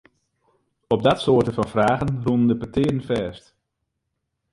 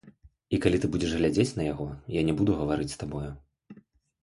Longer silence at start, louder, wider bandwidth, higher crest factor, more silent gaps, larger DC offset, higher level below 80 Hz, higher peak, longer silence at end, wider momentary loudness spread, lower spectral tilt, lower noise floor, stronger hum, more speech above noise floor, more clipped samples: first, 0.9 s vs 0.05 s; first, -21 LUFS vs -28 LUFS; about the same, 11.5 kHz vs 11.5 kHz; about the same, 20 dB vs 20 dB; neither; neither; about the same, -48 dBFS vs -46 dBFS; first, -4 dBFS vs -8 dBFS; first, 1.15 s vs 0.5 s; second, 7 LU vs 11 LU; about the same, -7.5 dB/octave vs -6.5 dB/octave; first, -78 dBFS vs -56 dBFS; neither; first, 57 dB vs 29 dB; neither